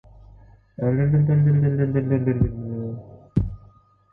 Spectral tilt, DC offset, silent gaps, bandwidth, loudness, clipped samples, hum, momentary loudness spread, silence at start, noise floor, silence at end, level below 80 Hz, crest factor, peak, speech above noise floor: -13 dB/octave; under 0.1%; none; 2.9 kHz; -22 LUFS; under 0.1%; none; 13 LU; 0.8 s; -53 dBFS; 0.55 s; -40 dBFS; 16 dB; -6 dBFS; 34 dB